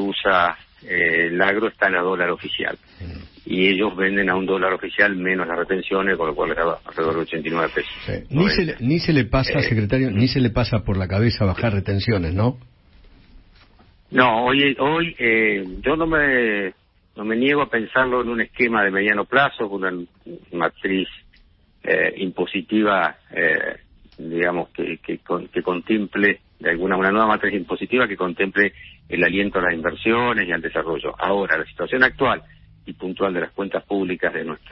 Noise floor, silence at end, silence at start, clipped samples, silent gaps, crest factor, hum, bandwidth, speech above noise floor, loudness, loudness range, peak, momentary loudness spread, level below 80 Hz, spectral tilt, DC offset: -54 dBFS; 0 s; 0 s; under 0.1%; none; 20 dB; none; 6 kHz; 34 dB; -20 LUFS; 3 LU; 0 dBFS; 10 LU; -44 dBFS; -9.5 dB/octave; under 0.1%